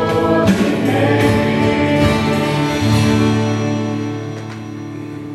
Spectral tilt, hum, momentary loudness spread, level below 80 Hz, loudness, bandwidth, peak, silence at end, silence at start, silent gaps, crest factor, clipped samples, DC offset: -6.5 dB/octave; none; 14 LU; -36 dBFS; -15 LUFS; 14 kHz; -2 dBFS; 0 s; 0 s; none; 14 dB; under 0.1%; under 0.1%